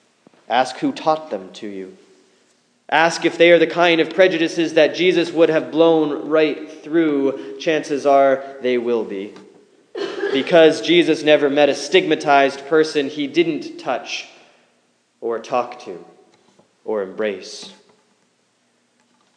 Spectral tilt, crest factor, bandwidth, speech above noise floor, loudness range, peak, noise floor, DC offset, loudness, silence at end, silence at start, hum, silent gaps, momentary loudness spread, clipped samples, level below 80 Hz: -4.5 dB/octave; 18 dB; 10 kHz; 46 dB; 12 LU; 0 dBFS; -63 dBFS; under 0.1%; -17 LUFS; 1.65 s; 0.5 s; none; none; 17 LU; under 0.1%; -80 dBFS